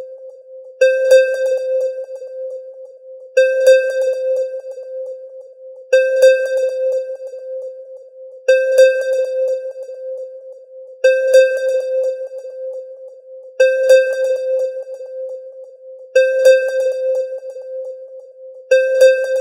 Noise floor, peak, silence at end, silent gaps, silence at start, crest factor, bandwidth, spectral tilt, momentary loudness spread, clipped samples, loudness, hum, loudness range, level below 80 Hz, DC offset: -37 dBFS; -2 dBFS; 0 s; none; 0 s; 14 dB; 13 kHz; 2 dB/octave; 24 LU; under 0.1%; -15 LUFS; none; 2 LU; -86 dBFS; under 0.1%